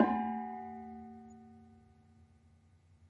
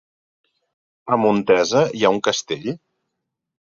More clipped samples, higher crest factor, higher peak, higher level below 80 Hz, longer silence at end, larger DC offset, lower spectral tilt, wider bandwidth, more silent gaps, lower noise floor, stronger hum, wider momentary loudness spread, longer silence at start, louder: neither; first, 28 dB vs 20 dB; second, -12 dBFS vs -2 dBFS; second, -72 dBFS vs -62 dBFS; second, 0.05 s vs 0.95 s; neither; first, -8 dB/octave vs -4.5 dB/octave; about the same, 7.4 kHz vs 7.6 kHz; neither; second, -65 dBFS vs -79 dBFS; neither; first, 24 LU vs 14 LU; second, 0 s vs 1.05 s; second, -39 LUFS vs -19 LUFS